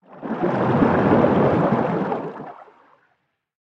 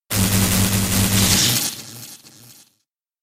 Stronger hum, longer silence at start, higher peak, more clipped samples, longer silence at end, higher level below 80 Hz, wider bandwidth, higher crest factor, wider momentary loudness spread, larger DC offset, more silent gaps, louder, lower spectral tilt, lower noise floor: neither; about the same, 0.1 s vs 0.1 s; about the same, -4 dBFS vs -2 dBFS; neither; first, 1 s vs 0.7 s; second, -52 dBFS vs -36 dBFS; second, 7.2 kHz vs 16.5 kHz; about the same, 18 dB vs 18 dB; second, 16 LU vs 20 LU; neither; neither; second, -20 LUFS vs -16 LUFS; first, -9.5 dB/octave vs -3 dB/octave; about the same, -70 dBFS vs -72 dBFS